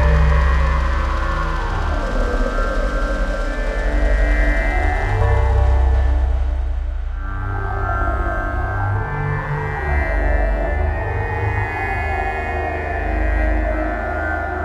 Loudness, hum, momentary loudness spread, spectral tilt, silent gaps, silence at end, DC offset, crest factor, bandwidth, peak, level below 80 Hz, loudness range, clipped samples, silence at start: -20 LUFS; none; 6 LU; -7.5 dB/octave; none; 0 s; 0.1%; 14 dB; 8.4 kHz; -4 dBFS; -20 dBFS; 3 LU; under 0.1%; 0 s